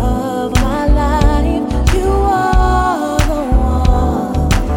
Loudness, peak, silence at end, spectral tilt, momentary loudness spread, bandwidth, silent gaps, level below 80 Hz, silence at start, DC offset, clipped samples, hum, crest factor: -15 LUFS; 0 dBFS; 0 s; -6.5 dB/octave; 3 LU; 17 kHz; none; -16 dBFS; 0 s; under 0.1%; under 0.1%; none; 12 dB